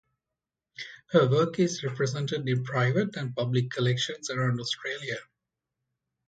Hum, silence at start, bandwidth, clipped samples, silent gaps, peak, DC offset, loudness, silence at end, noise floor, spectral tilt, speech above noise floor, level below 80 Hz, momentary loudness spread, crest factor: none; 0.8 s; 9.2 kHz; under 0.1%; none; -10 dBFS; under 0.1%; -28 LUFS; 1.05 s; -88 dBFS; -5.5 dB/octave; 61 dB; -68 dBFS; 10 LU; 20 dB